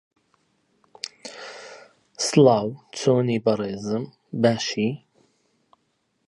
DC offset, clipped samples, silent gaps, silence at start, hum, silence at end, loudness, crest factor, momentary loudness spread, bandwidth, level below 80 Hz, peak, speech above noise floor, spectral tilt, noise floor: under 0.1%; under 0.1%; none; 1.05 s; none; 1.3 s; -22 LUFS; 20 dB; 21 LU; 11.5 kHz; -66 dBFS; -4 dBFS; 50 dB; -5.5 dB/octave; -71 dBFS